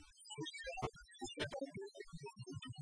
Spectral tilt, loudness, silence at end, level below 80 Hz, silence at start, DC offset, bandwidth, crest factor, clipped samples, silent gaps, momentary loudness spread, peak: -4 dB/octave; -48 LUFS; 0 s; -68 dBFS; 0 s; under 0.1%; 10.5 kHz; 20 dB; under 0.1%; none; 8 LU; -28 dBFS